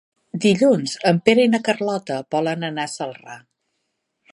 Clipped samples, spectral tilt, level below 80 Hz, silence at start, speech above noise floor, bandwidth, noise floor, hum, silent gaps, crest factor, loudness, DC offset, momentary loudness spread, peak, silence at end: under 0.1%; -5.5 dB/octave; -68 dBFS; 0.35 s; 55 dB; 11.5 kHz; -75 dBFS; none; none; 20 dB; -19 LUFS; under 0.1%; 15 LU; 0 dBFS; 0.95 s